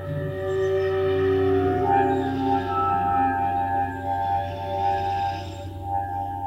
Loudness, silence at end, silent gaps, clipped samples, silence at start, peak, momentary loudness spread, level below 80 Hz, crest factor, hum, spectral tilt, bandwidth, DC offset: -24 LUFS; 0 s; none; under 0.1%; 0 s; -8 dBFS; 8 LU; -48 dBFS; 14 dB; none; -8 dB/octave; 15.5 kHz; under 0.1%